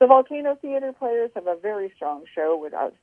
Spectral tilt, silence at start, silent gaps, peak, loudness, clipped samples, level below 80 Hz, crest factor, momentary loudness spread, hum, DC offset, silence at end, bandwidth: -6.5 dB/octave; 0 s; none; 0 dBFS; -24 LUFS; under 0.1%; -76 dBFS; 22 dB; 10 LU; none; under 0.1%; 0.15 s; 3.5 kHz